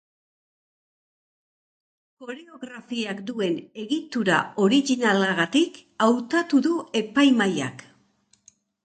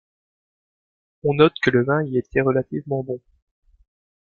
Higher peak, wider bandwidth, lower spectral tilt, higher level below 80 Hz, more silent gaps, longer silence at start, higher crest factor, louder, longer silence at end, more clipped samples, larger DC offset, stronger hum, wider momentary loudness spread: second, -6 dBFS vs -2 dBFS; first, 9.2 kHz vs 7 kHz; second, -4.5 dB/octave vs -8 dB/octave; second, -72 dBFS vs -54 dBFS; neither; first, 2.2 s vs 1.25 s; about the same, 18 dB vs 22 dB; about the same, -23 LUFS vs -21 LUFS; about the same, 1.05 s vs 1.1 s; neither; neither; neither; first, 18 LU vs 10 LU